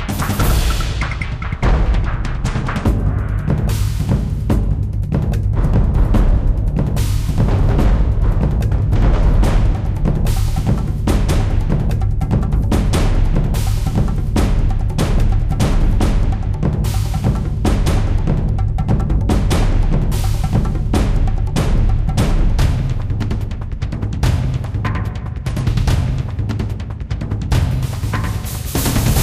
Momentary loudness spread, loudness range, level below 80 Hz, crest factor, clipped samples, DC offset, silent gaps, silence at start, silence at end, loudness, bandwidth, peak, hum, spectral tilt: 5 LU; 3 LU; -18 dBFS; 10 dB; under 0.1%; under 0.1%; none; 0 s; 0 s; -18 LUFS; 15.5 kHz; -4 dBFS; none; -6.5 dB/octave